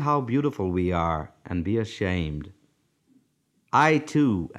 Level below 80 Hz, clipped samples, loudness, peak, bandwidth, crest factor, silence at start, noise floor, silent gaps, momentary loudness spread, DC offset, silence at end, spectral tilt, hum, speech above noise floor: -46 dBFS; under 0.1%; -25 LUFS; -6 dBFS; 11.5 kHz; 20 dB; 0 s; -69 dBFS; none; 12 LU; under 0.1%; 0 s; -7 dB/octave; none; 45 dB